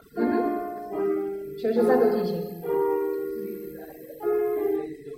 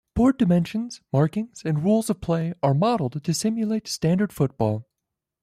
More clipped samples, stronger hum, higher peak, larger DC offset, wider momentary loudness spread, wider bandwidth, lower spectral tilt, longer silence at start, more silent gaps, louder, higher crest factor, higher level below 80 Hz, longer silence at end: neither; neither; about the same, -10 dBFS vs -8 dBFS; neither; first, 13 LU vs 6 LU; about the same, 16 kHz vs 15 kHz; about the same, -7.5 dB/octave vs -6.5 dB/octave; about the same, 0.15 s vs 0.15 s; neither; about the same, -26 LUFS vs -24 LUFS; about the same, 16 dB vs 14 dB; second, -64 dBFS vs -48 dBFS; second, 0 s vs 0.6 s